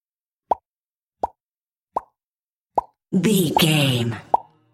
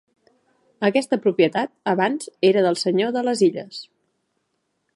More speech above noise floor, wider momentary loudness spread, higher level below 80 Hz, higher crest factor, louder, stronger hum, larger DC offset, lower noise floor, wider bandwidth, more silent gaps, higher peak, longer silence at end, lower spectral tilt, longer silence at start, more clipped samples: first, over 71 dB vs 53 dB; first, 15 LU vs 7 LU; first, -58 dBFS vs -72 dBFS; about the same, 20 dB vs 18 dB; about the same, -22 LUFS vs -20 LUFS; neither; neither; first, under -90 dBFS vs -73 dBFS; first, 16.5 kHz vs 11.5 kHz; first, 0.65-0.76 s, 0.83-1.10 s, 1.43-1.87 s, 2.27-2.32 s, 2.42-2.70 s vs none; about the same, -4 dBFS vs -4 dBFS; second, 0.3 s vs 1.1 s; about the same, -5 dB/octave vs -5 dB/octave; second, 0.5 s vs 0.8 s; neither